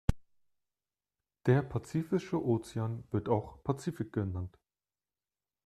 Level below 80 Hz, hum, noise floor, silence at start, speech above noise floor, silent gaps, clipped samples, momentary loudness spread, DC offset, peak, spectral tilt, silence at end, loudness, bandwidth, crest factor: -48 dBFS; 50 Hz at -60 dBFS; under -90 dBFS; 0.1 s; over 57 dB; none; under 0.1%; 8 LU; under 0.1%; -12 dBFS; -8 dB/octave; 1.15 s; -34 LUFS; 13 kHz; 24 dB